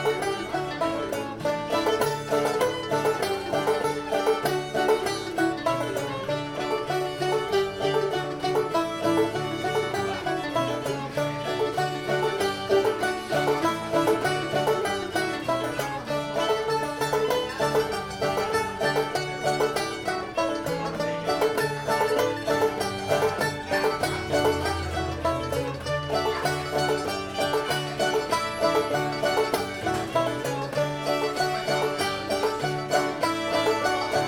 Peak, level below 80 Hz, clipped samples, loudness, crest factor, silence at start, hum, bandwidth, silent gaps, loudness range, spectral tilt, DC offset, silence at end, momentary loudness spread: -10 dBFS; -54 dBFS; under 0.1%; -26 LUFS; 16 dB; 0 s; none; 18 kHz; none; 2 LU; -4.5 dB/octave; under 0.1%; 0 s; 5 LU